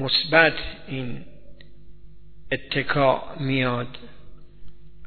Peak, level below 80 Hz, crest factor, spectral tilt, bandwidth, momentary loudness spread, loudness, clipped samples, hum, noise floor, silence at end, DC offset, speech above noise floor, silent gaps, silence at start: -2 dBFS; -46 dBFS; 24 dB; -8 dB/octave; 4.6 kHz; 18 LU; -22 LUFS; under 0.1%; 50 Hz at -50 dBFS; -48 dBFS; 0 s; 1%; 25 dB; none; 0 s